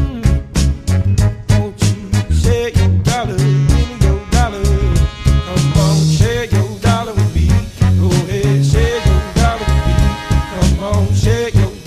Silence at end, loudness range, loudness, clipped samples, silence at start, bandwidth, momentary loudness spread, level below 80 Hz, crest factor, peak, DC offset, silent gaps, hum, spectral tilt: 0 s; 1 LU; -14 LUFS; under 0.1%; 0 s; 14.5 kHz; 4 LU; -18 dBFS; 12 dB; 0 dBFS; under 0.1%; none; none; -6 dB/octave